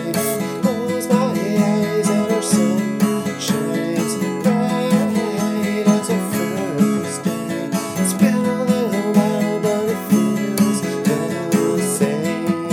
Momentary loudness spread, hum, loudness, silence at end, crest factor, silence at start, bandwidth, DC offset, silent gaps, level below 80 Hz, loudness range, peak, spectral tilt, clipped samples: 5 LU; none; -19 LUFS; 0 s; 16 dB; 0 s; 17.5 kHz; under 0.1%; none; -64 dBFS; 1 LU; -2 dBFS; -5.5 dB/octave; under 0.1%